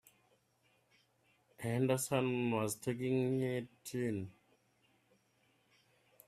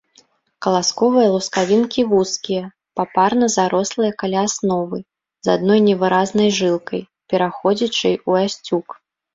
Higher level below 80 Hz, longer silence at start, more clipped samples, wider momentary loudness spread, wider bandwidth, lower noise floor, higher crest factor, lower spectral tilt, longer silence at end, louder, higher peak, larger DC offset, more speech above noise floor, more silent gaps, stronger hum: second, -76 dBFS vs -60 dBFS; first, 1.6 s vs 0.6 s; neither; about the same, 10 LU vs 10 LU; first, 15.5 kHz vs 7.8 kHz; first, -75 dBFS vs -56 dBFS; about the same, 20 dB vs 18 dB; about the same, -5.5 dB/octave vs -4.5 dB/octave; first, 1.95 s vs 0.4 s; second, -37 LUFS vs -18 LUFS; second, -18 dBFS vs 0 dBFS; neither; about the same, 39 dB vs 38 dB; neither; neither